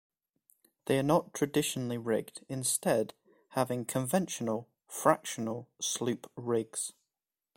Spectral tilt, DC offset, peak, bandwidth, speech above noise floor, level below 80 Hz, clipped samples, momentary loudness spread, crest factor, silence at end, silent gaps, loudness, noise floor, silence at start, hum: -4.5 dB/octave; under 0.1%; -8 dBFS; 16.5 kHz; over 58 dB; -70 dBFS; under 0.1%; 10 LU; 24 dB; 0.65 s; none; -32 LUFS; under -90 dBFS; 0.85 s; none